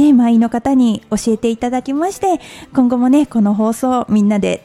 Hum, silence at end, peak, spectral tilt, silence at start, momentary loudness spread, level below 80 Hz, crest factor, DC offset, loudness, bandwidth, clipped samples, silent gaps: none; 0.05 s; -2 dBFS; -6.5 dB/octave; 0 s; 6 LU; -46 dBFS; 12 dB; under 0.1%; -15 LUFS; 13 kHz; under 0.1%; none